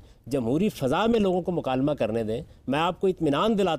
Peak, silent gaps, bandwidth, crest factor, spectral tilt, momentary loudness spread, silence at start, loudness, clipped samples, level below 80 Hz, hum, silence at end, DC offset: -12 dBFS; none; 15.5 kHz; 12 dB; -6.5 dB/octave; 7 LU; 0.25 s; -25 LUFS; under 0.1%; -50 dBFS; none; 0 s; under 0.1%